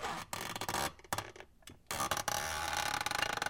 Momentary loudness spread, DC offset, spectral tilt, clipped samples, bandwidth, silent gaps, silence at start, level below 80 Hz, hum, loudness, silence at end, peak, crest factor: 16 LU; under 0.1%; -1.5 dB/octave; under 0.1%; 17 kHz; none; 0 s; -60 dBFS; none; -37 LUFS; 0 s; -18 dBFS; 20 dB